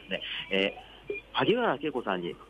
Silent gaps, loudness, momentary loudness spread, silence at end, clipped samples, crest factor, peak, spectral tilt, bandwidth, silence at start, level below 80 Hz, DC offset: none; -30 LUFS; 13 LU; 0.05 s; under 0.1%; 18 dB; -14 dBFS; -6.5 dB/octave; 10.5 kHz; 0 s; -60 dBFS; under 0.1%